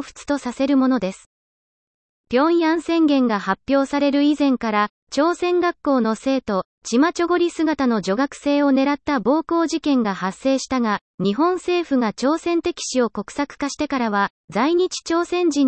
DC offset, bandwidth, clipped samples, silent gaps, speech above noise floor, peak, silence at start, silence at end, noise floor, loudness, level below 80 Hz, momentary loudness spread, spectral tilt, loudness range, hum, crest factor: under 0.1%; 8.8 kHz; under 0.1%; 1.26-2.24 s, 4.90-5.07 s, 6.65-6.82 s, 11.01-11.18 s, 14.30-14.48 s; over 71 dB; -6 dBFS; 0 s; 0 s; under -90 dBFS; -20 LUFS; -56 dBFS; 6 LU; -4.5 dB/octave; 3 LU; none; 14 dB